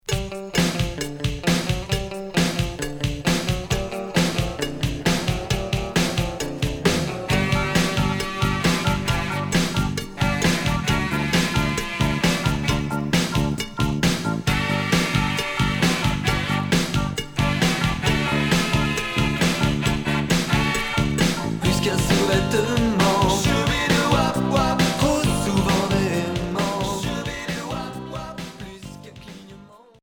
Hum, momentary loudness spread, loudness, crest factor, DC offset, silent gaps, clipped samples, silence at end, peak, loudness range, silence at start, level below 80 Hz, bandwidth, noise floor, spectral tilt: none; 7 LU; -22 LUFS; 16 dB; under 0.1%; none; under 0.1%; 0.25 s; -6 dBFS; 4 LU; 0.1 s; -34 dBFS; over 20 kHz; -46 dBFS; -4.5 dB/octave